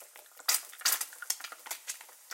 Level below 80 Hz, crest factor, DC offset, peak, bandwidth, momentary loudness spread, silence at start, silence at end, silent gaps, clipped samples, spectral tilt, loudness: under -90 dBFS; 28 dB; under 0.1%; -8 dBFS; 17 kHz; 13 LU; 0 s; 0 s; none; under 0.1%; 5.5 dB/octave; -33 LUFS